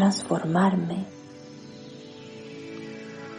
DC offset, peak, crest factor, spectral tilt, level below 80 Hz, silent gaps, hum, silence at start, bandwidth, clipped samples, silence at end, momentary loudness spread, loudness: under 0.1%; -10 dBFS; 18 dB; -6 dB/octave; -68 dBFS; none; none; 0 s; 10.5 kHz; under 0.1%; 0 s; 21 LU; -26 LUFS